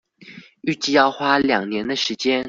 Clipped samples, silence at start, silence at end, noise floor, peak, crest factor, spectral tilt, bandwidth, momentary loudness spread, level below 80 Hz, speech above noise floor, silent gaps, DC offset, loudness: under 0.1%; 0.25 s; 0 s; -44 dBFS; -4 dBFS; 18 dB; -3.5 dB/octave; 7.6 kHz; 8 LU; -58 dBFS; 25 dB; none; under 0.1%; -20 LUFS